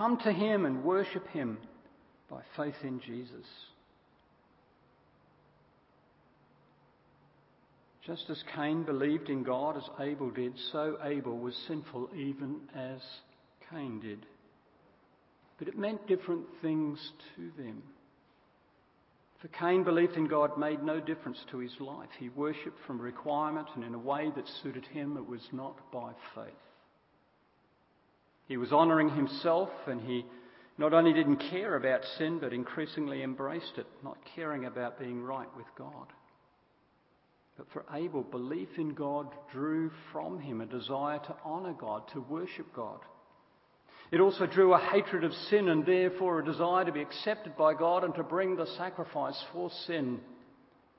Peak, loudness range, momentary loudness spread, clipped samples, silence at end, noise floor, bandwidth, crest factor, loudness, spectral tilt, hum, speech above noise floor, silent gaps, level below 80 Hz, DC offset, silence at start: -10 dBFS; 15 LU; 19 LU; under 0.1%; 0.6 s; -69 dBFS; 5.6 kHz; 24 dB; -33 LUFS; -4.5 dB/octave; none; 37 dB; none; -80 dBFS; under 0.1%; 0 s